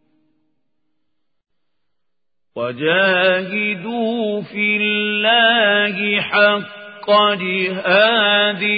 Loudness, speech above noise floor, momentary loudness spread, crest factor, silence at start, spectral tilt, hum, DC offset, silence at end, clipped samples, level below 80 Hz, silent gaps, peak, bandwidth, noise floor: -15 LUFS; 65 dB; 10 LU; 18 dB; 2.55 s; -9 dB/octave; none; under 0.1%; 0 s; under 0.1%; -72 dBFS; none; 0 dBFS; 5 kHz; -82 dBFS